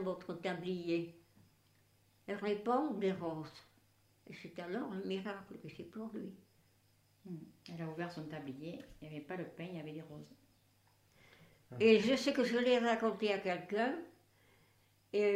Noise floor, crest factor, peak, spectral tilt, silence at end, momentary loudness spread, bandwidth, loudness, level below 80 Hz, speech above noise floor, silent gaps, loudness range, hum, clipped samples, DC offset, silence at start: -72 dBFS; 24 dB; -16 dBFS; -5.5 dB/octave; 0 s; 20 LU; 15.5 kHz; -37 LUFS; -76 dBFS; 34 dB; none; 14 LU; none; under 0.1%; under 0.1%; 0 s